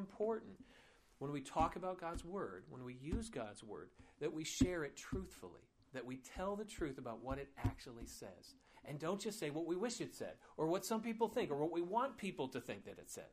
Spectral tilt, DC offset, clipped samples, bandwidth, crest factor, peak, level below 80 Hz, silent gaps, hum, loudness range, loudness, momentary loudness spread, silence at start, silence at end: -5 dB/octave; under 0.1%; under 0.1%; 15.5 kHz; 24 dB; -20 dBFS; -58 dBFS; none; none; 6 LU; -44 LUFS; 15 LU; 0 s; 0 s